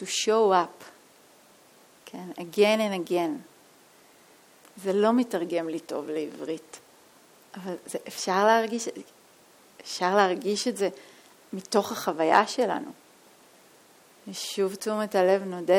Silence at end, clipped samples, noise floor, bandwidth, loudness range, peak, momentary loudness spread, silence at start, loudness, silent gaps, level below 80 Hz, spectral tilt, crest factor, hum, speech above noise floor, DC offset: 0 s; under 0.1%; -56 dBFS; 17.5 kHz; 3 LU; -4 dBFS; 19 LU; 0 s; -26 LUFS; none; -80 dBFS; -4 dB/octave; 24 dB; none; 30 dB; under 0.1%